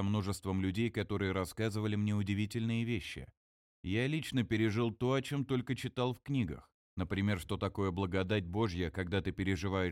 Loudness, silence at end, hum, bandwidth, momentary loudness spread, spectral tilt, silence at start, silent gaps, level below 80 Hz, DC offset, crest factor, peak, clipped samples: -35 LUFS; 0 s; none; 15.5 kHz; 5 LU; -6.5 dB/octave; 0 s; 3.37-3.83 s, 6.74-6.97 s; -56 dBFS; under 0.1%; 16 dB; -20 dBFS; under 0.1%